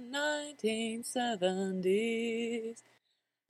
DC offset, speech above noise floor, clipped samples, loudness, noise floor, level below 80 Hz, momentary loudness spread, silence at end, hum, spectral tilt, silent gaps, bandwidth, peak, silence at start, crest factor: under 0.1%; 48 dB; under 0.1%; -34 LUFS; -82 dBFS; -82 dBFS; 7 LU; 0.7 s; none; -4 dB/octave; none; 14.5 kHz; -18 dBFS; 0 s; 16 dB